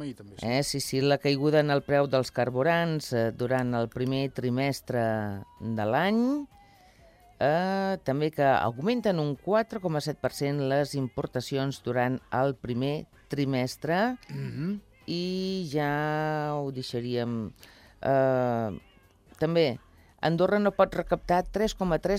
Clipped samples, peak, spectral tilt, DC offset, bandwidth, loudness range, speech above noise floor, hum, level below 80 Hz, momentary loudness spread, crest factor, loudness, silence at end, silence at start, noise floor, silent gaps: under 0.1%; -10 dBFS; -6 dB/octave; under 0.1%; 16 kHz; 4 LU; 30 dB; none; -54 dBFS; 9 LU; 18 dB; -28 LUFS; 0 s; 0 s; -57 dBFS; none